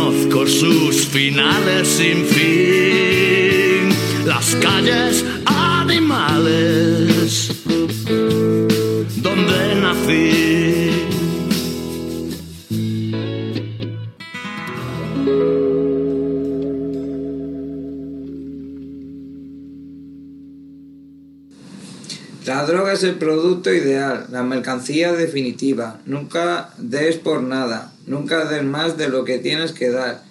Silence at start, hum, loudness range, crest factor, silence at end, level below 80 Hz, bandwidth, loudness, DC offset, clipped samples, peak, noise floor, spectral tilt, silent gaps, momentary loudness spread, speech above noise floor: 0 s; none; 16 LU; 18 dB; 0.1 s; -50 dBFS; 16.5 kHz; -17 LUFS; under 0.1%; under 0.1%; 0 dBFS; -43 dBFS; -4.5 dB/octave; none; 16 LU; 26 dB